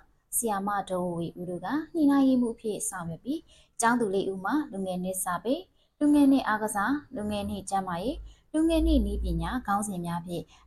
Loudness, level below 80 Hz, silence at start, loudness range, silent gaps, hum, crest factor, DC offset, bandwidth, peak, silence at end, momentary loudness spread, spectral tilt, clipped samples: -28 LUFS; -40 dBFS; 0.3 s; 3 LU; none; none; 16 dB; under 0.1%; 14 kHz; -12 dBFS; 0.25 s; 12 LU; -5 dB/octave; under 0.1%